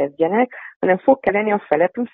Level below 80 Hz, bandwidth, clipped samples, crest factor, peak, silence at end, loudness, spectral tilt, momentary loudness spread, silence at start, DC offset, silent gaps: -60 dBFS; 3.9 kHz; under 0.1%; 16 dB; -2 dBFS; 0.05 s; -18 LUFS; -10.5 dB/octave; 5 LU; 0 s; under 0.1%; 0.76-0.80 s